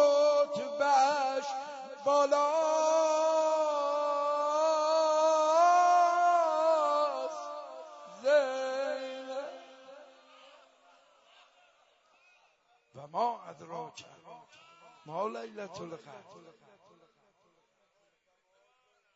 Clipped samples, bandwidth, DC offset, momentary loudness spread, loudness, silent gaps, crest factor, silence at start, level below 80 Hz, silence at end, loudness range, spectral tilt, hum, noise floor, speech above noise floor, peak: under 0.1%; 8 kHz; under 0.1%; 19 LU; -29 LUFS; none; 16 dB; 0 s; -88 dBFS; 2.8 s; 17 LU; -2.5 dB/octave; none; -74 dBFS; 29 dB; -14 dBFS